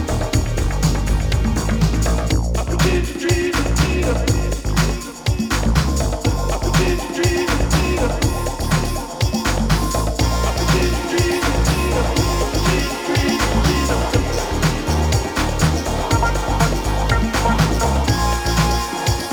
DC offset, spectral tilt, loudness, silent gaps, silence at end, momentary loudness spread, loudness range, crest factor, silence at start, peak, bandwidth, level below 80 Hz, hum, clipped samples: under 0.1%; -5 dB/octave; -19 LUFS; none; 0 s; 3 LU; 1 LU; 16 dB; 0 s; -2 dBFS; over 20 kHz; -22 dBFS; none; under 0.1%